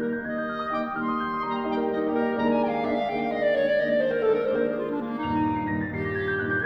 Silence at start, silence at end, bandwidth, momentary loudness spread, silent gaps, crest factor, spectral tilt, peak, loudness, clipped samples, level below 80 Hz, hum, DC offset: 0 s; 0 s; 6 kHz; 6 LU; none; 14 dB; -8.5 dB/octave; -12 dBFS; -26 LUFS; under 0.1%; -54 dBFS; none; under 0.1%